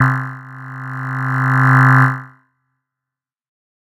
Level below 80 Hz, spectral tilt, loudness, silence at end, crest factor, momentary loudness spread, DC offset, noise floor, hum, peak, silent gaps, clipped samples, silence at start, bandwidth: -64 dBFS; -8 dB/octave; -14 LUFS; 1.55 s; 16 dB; 20 LU; under 0.1%; -86 dBFS; none; 0 dBFS; none; under 0.1%; 0 s; 7.2 kHz